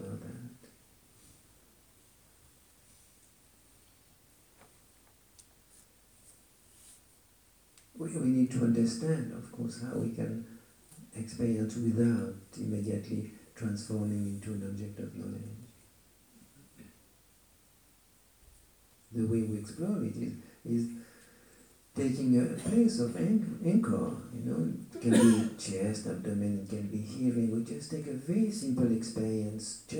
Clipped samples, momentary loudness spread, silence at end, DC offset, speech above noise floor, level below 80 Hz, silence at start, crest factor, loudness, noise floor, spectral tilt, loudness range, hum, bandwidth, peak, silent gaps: under 0.1%; 14 LU; 0 s; under 0.1%; 33 dB; -68 dBFS; 0 s; 22 dB; -32 LUFS; -64 dBFS; -6.5 dB/octave; 11 LU; none; over 20 kHz; -10 dBFS; none